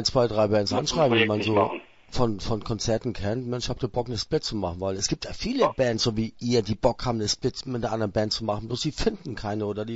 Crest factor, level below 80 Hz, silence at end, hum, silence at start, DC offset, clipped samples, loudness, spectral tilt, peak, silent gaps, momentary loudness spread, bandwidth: 18 dB; -42 dBFS; 0 s; none; 0 s; under 0.1%; under 0.1%; -26 LUFS; -5 dB/octave; -8 dBFS; none; 7 LU; 8 kHz